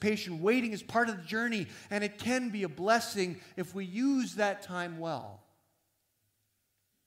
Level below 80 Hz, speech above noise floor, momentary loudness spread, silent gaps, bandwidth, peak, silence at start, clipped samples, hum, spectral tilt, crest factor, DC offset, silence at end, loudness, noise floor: -76 dBFS; 46 dB; 10 LU; none; 16 kHz; -14 dBFS; 0 s; under 0.1%; none; -4.5 dB/octave; 18 dB; under 0.1%; 1.7 s; -33 LUFS; -78 dBFS